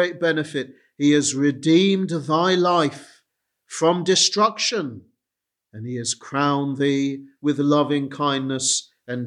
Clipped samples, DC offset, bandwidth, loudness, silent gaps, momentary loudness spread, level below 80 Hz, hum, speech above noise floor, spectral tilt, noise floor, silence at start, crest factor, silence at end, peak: under 0.1%; under 0.1%; 11 kHz; -20 LUFS; none; 11 LU; -72 dBFS; none; 64 dB; -4 dB/octave; -84 dBFS; 0 s; 18 dB; 0 s; -4 dBFS